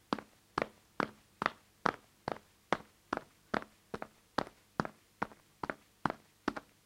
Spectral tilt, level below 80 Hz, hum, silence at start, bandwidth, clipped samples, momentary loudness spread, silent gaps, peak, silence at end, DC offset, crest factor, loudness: -5 dB/octave; -68 dBFS; none; 0.1 s; 16.5 kHz; under 0.1%; 8 LU; none; -10 dBFS; 0.25 s; under 0.1%; 32 dB; -41 LUFS